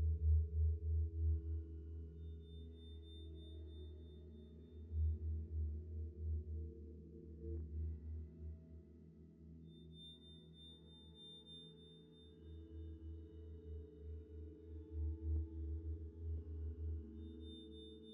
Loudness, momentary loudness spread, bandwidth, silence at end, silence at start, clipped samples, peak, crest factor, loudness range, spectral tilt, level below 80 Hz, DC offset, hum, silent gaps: -47 LUFS; 18 LU; 3.8 kHz; 0 s; 0 s; under 0.1%; -28 dBFS; 18 dB; 11 LU; -9.5 dB/octave; -50 dBFS; under 0.1%; none; none